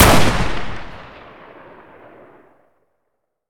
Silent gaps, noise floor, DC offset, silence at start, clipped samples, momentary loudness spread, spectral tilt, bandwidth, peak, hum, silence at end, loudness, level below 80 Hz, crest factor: none; -74 dBFS; under 0.1%; 0 s; under 0.1%; 27 LU; -4 dB/octave; 19 kHz; 0 dBFS; none; 2.45 s; -17 LUFS; -30 dBFS; 18 dB